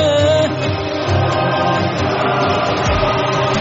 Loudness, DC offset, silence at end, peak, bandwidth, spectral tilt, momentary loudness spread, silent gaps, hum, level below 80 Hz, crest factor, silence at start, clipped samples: -16 LUFS; under 0.1%; 0 s; -4 dBFS; 8 kHz; -4 dB/octave; 4 LU; none; none; -34 dBFS; 12 dB; 0 s; under 0.1%